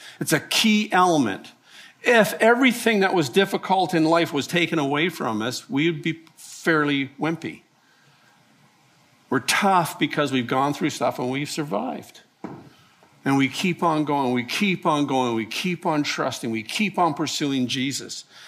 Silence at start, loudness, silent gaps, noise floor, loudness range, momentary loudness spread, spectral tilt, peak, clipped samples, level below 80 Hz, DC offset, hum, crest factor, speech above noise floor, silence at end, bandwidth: 0 s; -22 LUFS; none; -58 dBFS; 7 LU; 10 LU; -4.5 dB/octave; -4 dBFS; under 0.1%; -72 dBFS; under 0.1%; none; 20 dB; 36 dB; 0 s; 15.5 kHz